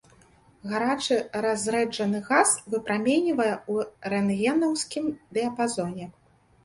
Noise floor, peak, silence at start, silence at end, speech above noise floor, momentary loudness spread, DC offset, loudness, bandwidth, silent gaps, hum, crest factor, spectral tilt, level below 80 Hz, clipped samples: -57 dBFS; -6 dBFS; 0.65 s; 0.55 s; 32 dB; 9 LU; under 0.1%; -26 LUFS; 11.5 kHz; none; none; 20 dB; -4 dB/octave; -64 dBFS; under 0.1%